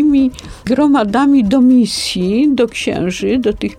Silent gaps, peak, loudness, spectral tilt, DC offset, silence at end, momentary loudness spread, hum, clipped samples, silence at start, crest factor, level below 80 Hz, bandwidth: none; -2 dBFS; -13 LUFS; -5.5 dB/octave; under 0.1%; 0.05 s; 7 LU; none; under 0.1%; 0 s; 10 dB; -38 dBFS; 13.5 kHz